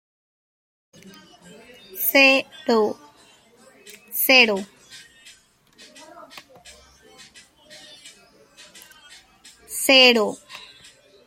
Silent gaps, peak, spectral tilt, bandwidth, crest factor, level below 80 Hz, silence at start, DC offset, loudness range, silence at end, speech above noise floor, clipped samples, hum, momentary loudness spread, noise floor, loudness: none; 0 dBFS; -1.5 dB/octave; 16.5 kHz; 24 dB; -68 dBFS; 1.95 s; under 0.1%; 3 LU; 0.7 s; 38 dB; under 0.1%; none; 27 LU; -55 dBFS; -17 LUFS